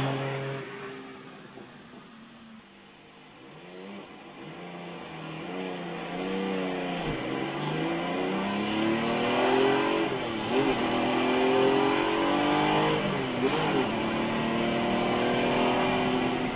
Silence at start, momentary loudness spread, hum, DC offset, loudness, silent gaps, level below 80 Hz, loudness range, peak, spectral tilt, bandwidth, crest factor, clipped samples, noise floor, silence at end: 0 s; 20 LU; none; under 0.1%; -27 LUFS; none; -56 dBFS; 19 LU; -12 dBFS; -3.5 dB/octave; 4 kHz; 18 dB; under 0.1%; -52 dBFS; 0 s